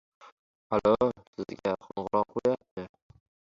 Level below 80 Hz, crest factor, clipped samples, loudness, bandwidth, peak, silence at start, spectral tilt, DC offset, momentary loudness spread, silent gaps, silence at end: -62 dBFS; 20 dB; under 0.1%; -30 LUFS; 7.4 kHz; -12 dBFS; 0.25 s; -7.5 dB/octave; under 0.1%; 17 LU; 0.32-0.70 s, 1.27-1.33 s, 2.71-2.77 s; 0.55 s